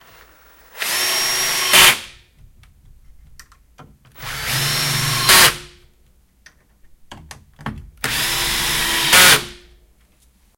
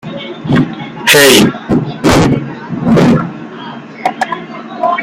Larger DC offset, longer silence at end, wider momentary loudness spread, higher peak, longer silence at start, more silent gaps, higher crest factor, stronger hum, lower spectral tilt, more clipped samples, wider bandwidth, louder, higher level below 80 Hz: neither; first, 1 s vs 0 s; first, 23 LU vs 19 LU; about the same, 0 dBFS vs 0 dBFS; first, 0.75 s vs 0.05 s; neither; first, 20 dB vs 12 dB; neither; second, -0.5 dB/octave vs -4.5 dB/octave; second, under 0.1% vs 0.2%; second, 18 kHz vs over 20 kHz; second, -14 LUFS vs -10 LUFS; second, -42 dBFS vs -36 dBFS